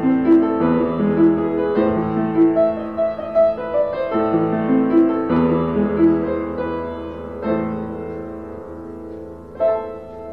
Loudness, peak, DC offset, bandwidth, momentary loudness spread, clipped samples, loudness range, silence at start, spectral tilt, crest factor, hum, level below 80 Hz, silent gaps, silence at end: -18 LUFS; -6 dBFS; 0.3%; 4.8 kHz; 17 LU; under 0.1%; 8 LU; 0 s; -10.5 dB/octave; 12 dB; none; -44 dBFS; none; 0 s